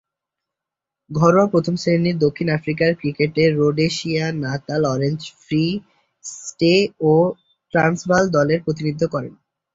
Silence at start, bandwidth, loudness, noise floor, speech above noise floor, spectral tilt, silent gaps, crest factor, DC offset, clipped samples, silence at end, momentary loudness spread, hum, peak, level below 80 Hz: 1.1 s; 8 kHz; -19 LUFS; -85 dBFS; 67 dB; -6 dB/octave; none; 16 dB; under 0.1%; under 0.1%; 0.4 s; 12 LU; none; -2 dBFS; -54 dBFS